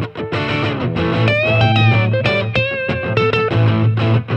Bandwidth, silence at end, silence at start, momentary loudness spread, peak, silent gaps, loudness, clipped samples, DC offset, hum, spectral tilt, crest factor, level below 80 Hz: 6.6 kHz; 0 s; 0 s; 6 LU; -2 dBFS; none; -16 LUFS; under 0.1%; under 0.1%; none; -7.5 dB/octave; 14 dB; -40 dBFS